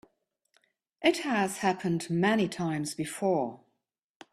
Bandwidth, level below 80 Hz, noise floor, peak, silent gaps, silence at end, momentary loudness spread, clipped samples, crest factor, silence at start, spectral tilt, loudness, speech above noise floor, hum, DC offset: 14 kHz; -70 dBFS; -80 dBFS; -10 dBFS; none; 0.75 s; 6 LU; under 0.1%; 20 dB; 1 s; -5 dB/octave; -29 LUFS; 51 dB; none; under 0.1%